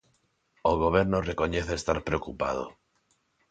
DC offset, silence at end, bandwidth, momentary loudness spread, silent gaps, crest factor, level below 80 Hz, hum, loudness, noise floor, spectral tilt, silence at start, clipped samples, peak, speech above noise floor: under 0.1%; 0.8 s; 9.4 kHz; 8 LU; none; 20 dB; -44 dBFS; none; -28 LUFS; -72 dBFS; -6 dB/octave; 0.65 s; under 0.1%; -8 dBFS; 44 dB